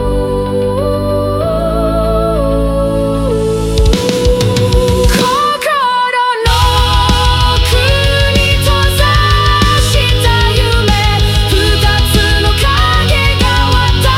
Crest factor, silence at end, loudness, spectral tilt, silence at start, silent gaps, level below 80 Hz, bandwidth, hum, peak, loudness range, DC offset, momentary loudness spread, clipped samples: 10 dB; 0 s; -11 LUFS; -4.5 dB/octave; 0 s; none; -16 dBFS; 16.5 kHz; none; 0 dBFS; 3 LU; under 0.1%; 4 LU; under 0.1%